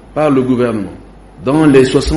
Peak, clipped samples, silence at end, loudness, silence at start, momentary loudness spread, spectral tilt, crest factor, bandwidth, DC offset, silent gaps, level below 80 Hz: 0 dBFS; under 0.1%; 0 s; -12 LUFS; 0.15 s; 14 LU; -6.5 dB/octave; 12 dB; 11.5 kHz; under 0.1%; none; -30 dBFS